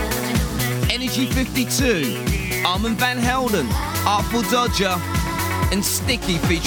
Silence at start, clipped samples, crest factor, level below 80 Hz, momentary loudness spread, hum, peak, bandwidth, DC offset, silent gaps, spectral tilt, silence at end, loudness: 0 s; under 0.1%; 16 dB; -30 dBFS; 4 LU; none; -4 dBFS; 19.5 kHz; under 0.1%; none; -4 dB/octave; 0 s; -20 LUFS